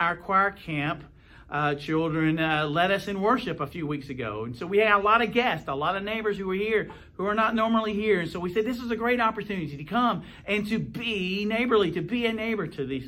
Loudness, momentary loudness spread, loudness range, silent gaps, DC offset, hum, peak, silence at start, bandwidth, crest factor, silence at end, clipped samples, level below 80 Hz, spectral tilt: -26 LUFS; 9 LU; 2 LU; none; under 0.1%; none; -8 dBFS; 0 s; 16 kHz; 18 dB; 0 s; under 0.1%; -54 dBFS; -6.5 dB/octave